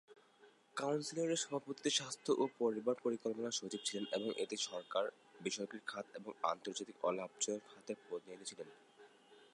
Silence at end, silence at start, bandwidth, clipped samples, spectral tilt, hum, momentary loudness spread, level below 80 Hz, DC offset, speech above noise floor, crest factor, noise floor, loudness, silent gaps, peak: 0.1 s; 0.1 s; 11.5 kHz; under 0.1%; -3 dB/octave; none; 12 LU; under -90 dBFS; under 0.1%; 27 dB; 22 dB; -68 dBFS; -41 LUFS; none; -20 dBFS